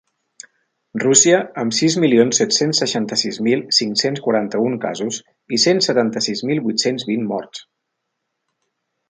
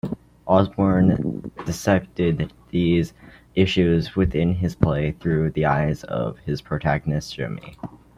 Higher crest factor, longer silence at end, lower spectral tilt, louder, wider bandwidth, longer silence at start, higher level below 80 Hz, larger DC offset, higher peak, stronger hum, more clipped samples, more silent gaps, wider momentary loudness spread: about the same, 18 dB vs 20 dB; first, 1.5 s vs 0.3 s; second, -3 dB/octave vs -7 dB/octave; first, -17 LUFS vs -22 LUFS; second, 10 kHz vs 14 kHz; first, 0.95 s vs 0.05 s; second, -66 dBFS vs -42 dBFS; neither; about the same, 0 dBFS vs -2 dBFS; neither; neither; neither; about the same, 11 LU vs 12 LU